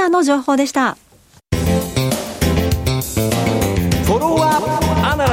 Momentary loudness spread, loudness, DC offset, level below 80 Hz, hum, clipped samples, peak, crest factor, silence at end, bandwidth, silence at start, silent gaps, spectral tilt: 5 LU; -17 LUFS; under 0.1%; -30 dBFS; none; under 0.1%; -4 dBFS; 14 dB; 0 s; 16.5 kHz; 0 s; none; -5.5 dB/octave